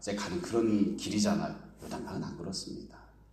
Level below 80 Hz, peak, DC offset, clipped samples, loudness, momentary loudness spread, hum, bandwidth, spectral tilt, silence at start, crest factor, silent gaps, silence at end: -58 dBFS; -16 dBFS; under 0.1%; under 0.1%; -33 LUFS; 15 LU; none; 13.5 kHz; -5 dB/octave; 0 s; 16 dB; none; 0.1 s